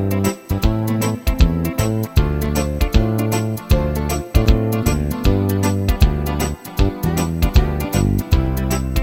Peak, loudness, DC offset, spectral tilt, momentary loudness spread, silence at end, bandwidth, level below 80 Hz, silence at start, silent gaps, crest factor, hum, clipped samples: 0 dBFS; -19 LUFS; under 0.1%; -6 dB/octave; 4 LU; 0 s; 17 kHz; -20 dBFS; 0 s; none; 16 dB; none; under 0.1%